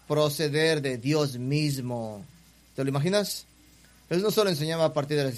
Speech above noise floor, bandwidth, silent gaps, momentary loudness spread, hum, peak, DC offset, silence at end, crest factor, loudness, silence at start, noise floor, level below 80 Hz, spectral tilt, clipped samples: 30 dB; 15.5 kHz; none; 10 LU; none; -10 dBFS; under 0.1%; 0 s; 16 dB; -27 LUFS; 0.1 s; -56 dBFS; -62 dBFS; -5 dB/octave; under 0.1%